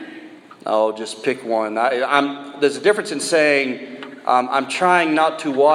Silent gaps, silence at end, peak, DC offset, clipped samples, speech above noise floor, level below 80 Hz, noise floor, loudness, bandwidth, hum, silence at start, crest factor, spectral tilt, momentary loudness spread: none; 0 s; 0 dBFS; under 0.1%; under 0.1%; 22 dB; -74 dBFS; -40 dBFS; -19 LUFS; 13 kHz; none; 0 s; 18 dB; -3.5 dB/octave; 11 LU